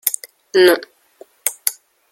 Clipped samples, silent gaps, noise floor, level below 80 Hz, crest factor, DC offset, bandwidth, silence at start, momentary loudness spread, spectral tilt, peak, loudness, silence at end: under 0.1%; none; -47 dBFS; -64 dBFS; 20 dB; under 0.1%; 17 kHz; 0.05 s; 10 LU; -1.5 dB/octave; 0 dBFS; -17 LUFS; 0.4 s